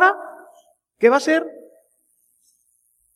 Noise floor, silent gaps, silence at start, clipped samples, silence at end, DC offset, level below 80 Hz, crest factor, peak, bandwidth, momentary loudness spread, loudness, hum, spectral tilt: -65 dBFS; none; 0 s; under 0.1%; 1.65 s; under 0.1%; -76 dBFS; 22 dB; -2 dBFS; 13.5 kHz; 19 LU; -18 LUFS; none; -3.5 dB/octave